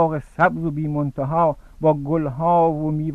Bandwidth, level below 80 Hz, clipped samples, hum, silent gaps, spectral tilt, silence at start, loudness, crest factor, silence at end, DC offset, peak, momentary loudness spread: 4.1 kHz; -44 dBFS; under 0.1%; none; none; -10 dB/octave; 0 s; -21 LUFS; 16 dB; 0 s; under 0.1%; -4 dBFS; 6 LU